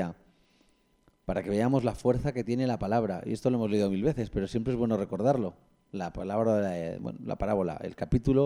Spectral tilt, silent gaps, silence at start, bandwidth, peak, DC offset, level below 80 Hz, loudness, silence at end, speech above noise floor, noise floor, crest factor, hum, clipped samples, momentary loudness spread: -8 dB/octave; none; 0 s; 11.5 kHz; -12 dBFS; under 0.1%; -48 dBFS; -30 LUFS; 0 s; 38 dB; -67 dBFS; 16 dB; none; under 0.1%; 10 LU